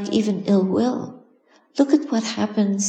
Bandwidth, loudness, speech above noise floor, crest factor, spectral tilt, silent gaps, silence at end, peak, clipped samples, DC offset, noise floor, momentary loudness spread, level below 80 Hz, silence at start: 9.2 kHz; -21 LUFS; 37 dB; 16 dB; -5.5 dB/octave; none; 0 s; -4 dBFS; under 0.1%; under 0.1%; -57 dBFS; 11 LU; -66 dBFS; 0 s